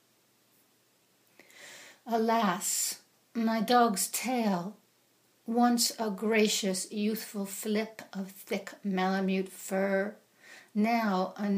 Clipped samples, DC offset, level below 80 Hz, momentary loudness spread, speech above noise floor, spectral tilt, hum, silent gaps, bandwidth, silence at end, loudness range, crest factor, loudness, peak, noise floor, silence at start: under 0.1%; under 0.1%; -82 dBFS; 15 LU; 39 dB; -4 dB/octave; none; none; 15.5 kHz; 0 s; 4 LU; 20 dB; -30 LUFS; -12 dBFS; -68 dBFS; 1.55 s